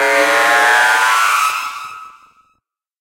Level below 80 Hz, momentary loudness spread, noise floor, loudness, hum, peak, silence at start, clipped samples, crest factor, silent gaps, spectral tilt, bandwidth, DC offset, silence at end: -66 dBFS; 15 LU; -67 dBFS; -12 LUFS; none; 0 dBFS; 0 s; under 0.1%; 14 dB; none; 0.5 dB/octave; 16.5 kHz; under 0.1%; 0.9 s